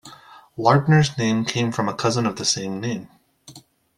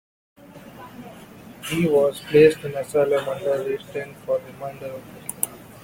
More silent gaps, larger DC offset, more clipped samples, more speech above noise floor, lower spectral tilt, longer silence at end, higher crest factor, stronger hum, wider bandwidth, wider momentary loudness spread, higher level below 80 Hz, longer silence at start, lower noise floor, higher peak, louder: neither; neither; neither; first, 27 dB vs 21 dB; about the same, -5 dB/octave vs -5 dB/octave; first, 0.4 s vs 0.05 s; about the same, 20 dB vs 24 dB; neither; second, 12 kHz vs 16.5 kHz; second, 12 LU vs 25 LU; about the same, -56 dBFS vs -58 dBFS; second, 0.05 s vs 0.55 s; first, -47 dBFS vs -43 dBFS; about the same, -2 dBFS vs 0 dBFS; about the same, -21 LUFS vs -22 LUFS